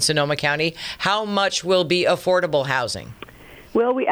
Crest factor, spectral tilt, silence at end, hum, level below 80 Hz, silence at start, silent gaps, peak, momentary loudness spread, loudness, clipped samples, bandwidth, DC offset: 16 dB; -3.5 dB/octave; 0 s; none; -54 dBFS; 0 s; none; -4 dBFS; 10 LU; -21 LUFS; under 0.1%; over 20 kHz; under 0.1%